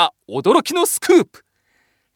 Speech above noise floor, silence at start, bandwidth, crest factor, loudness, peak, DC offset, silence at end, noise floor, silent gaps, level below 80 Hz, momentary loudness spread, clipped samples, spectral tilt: 47 dB; 0 s; 19 kHz; 16 dB; -16 LUFS; -2 dBFS; under 0.1%; 0.9 s; -64 dBFS; none; -64 dBFS; 6 LU; under 0.1%; -3 dB/octave